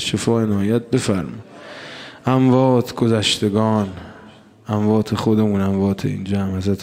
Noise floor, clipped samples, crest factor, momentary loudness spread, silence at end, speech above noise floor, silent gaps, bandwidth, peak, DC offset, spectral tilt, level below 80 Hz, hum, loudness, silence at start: -44 dBFS; under 0.1%; 16 dB; 19 LU; 0 s; 26 dB; none; 15.5 kHz; -2 dBFS; under 0.1%; -6 dB/octave; -52 dBFS; none; -18 LUFS; 0 s